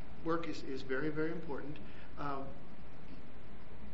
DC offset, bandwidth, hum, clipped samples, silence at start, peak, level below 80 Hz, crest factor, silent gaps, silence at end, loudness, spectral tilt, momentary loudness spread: 2%; 7.6 kHz; none; under 0.1%; 0 s; -22 dBFS; -58 dBFS; 20 dB; none; 0 s; -41 LUFS; -5 dB/octave; 17 LU